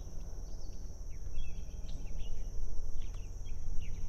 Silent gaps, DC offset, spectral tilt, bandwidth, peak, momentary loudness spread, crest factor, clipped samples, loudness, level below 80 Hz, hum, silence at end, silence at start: none; under 0.1%; -5 dB/octave; 6.8 kHz; -18 dBFS; 3 LU; 14 dB; under 0.1%; -47 LUFS; -38 dBFS; none; 0 s; 0 s